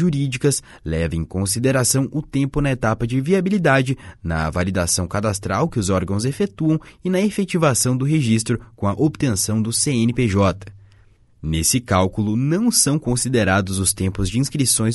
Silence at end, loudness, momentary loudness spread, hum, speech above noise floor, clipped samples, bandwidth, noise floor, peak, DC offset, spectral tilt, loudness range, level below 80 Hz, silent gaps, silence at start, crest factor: 0 s; -19 LUFS; 6 LU; none; 32 dB; under 0.1%; 12 kHz; -51 dBFS; -2 dBFS; under 0.1%; -4.5 dB/octave; 2 LU; -38 dBFS; none; 0 s; 16 dB